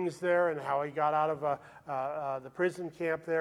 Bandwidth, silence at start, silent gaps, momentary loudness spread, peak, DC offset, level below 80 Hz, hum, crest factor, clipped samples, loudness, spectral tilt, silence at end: 12.5 kHz; 0 s; none; 8 LU; -16 dBFS; under 0.1%; -74 dBFS; none; 16 dB; under 0.1%; -32 LUFS; -6.5 dB/octave; 0 s